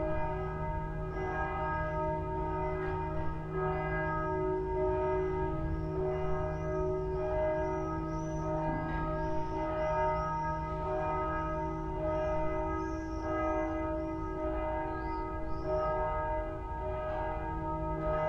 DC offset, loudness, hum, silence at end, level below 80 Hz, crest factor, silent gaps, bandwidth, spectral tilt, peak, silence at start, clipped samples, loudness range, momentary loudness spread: under 0.1%; -35 LUFS; none; 0 s; -42 dBFS; 14 dB; none; 7 kHz; -8.5 dB/octave; -20 dBFS; 0 s; under 0.1%; 2 LU; 5 LU